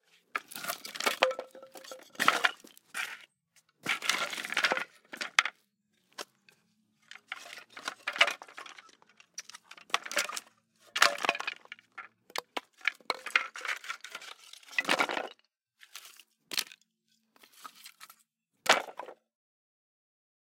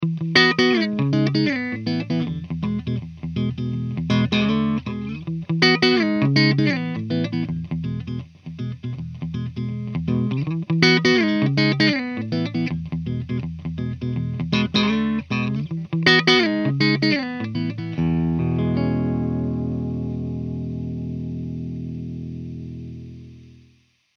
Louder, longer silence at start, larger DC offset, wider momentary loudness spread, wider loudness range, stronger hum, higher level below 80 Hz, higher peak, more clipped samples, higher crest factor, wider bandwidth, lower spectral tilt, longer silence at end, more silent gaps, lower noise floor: second, -31 LUFS vs -21 LUFS; first, 0.35 s vs 0 s; neither; first, 22 LU vs 14 LU; second, 4 LU vs 8 LU; second, none vs 60 Hz at -50 dBFS; second, -86 dBFS vs -46 dBFS; about the same, -2 dBFS vs 0 dBFS; neither; first, 34 dB vs 22 dB; first, 17 kHz vs 7 kHz; second, 0 dB/octave vs -6 dB/octave; first, 1.3 s vs 0.65 s; neither; first, -76 dBFS vs -59 dBFS